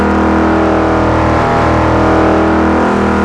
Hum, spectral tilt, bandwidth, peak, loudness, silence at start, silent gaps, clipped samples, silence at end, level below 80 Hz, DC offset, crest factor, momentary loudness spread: none; -7.5 dB/octave; 11 kHz; 0 dBFS; -10 LUFS; 0 s; none; under 0.1%; 0 s; -22 dBFS; under 0.1%; 10 dB; 1 LU